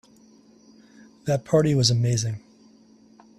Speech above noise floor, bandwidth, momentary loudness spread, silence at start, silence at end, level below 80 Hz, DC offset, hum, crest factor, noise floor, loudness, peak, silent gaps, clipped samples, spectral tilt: 33 dB; 12.5 kHz; 14 LU; 1.25 s; 1 s; -56 dBFS; under 0.1%; none; 20 dB; -54 dBFS; -23 LUFS; -6 dBFS; none; under 0.1%; -5.5 dB/octave